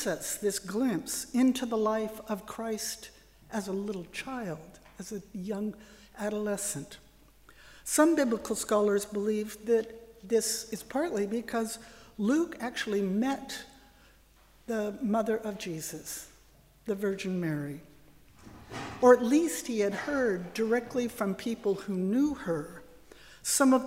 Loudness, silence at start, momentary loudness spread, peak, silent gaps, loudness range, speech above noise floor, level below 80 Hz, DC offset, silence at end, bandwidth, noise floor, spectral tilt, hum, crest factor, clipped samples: -30 LUFS; 0 s; 16 LU; -8 dBFS; none; 9 LU; 30 dB; -62 dBFS; under 0.1%; 0 s; 16 kHz; -60 dBFS; -4.5 dB/octave; none; 22 dB; under 0.1%